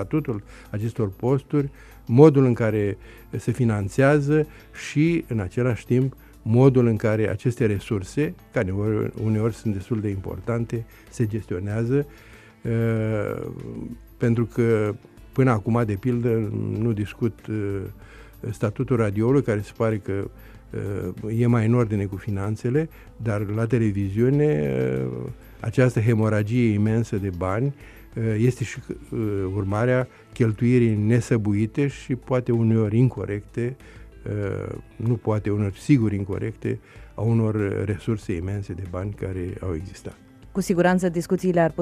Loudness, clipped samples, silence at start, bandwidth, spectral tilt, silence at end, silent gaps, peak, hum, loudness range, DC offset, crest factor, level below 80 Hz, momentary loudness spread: -23 LUFS; under 0.1%; 0 s; 13 kHz; -8.5 dB/octave; 0 s; none; -2 dBFS; none; 5 LU; under 0.1%; 22 dB; -48 dBFS; 13 LU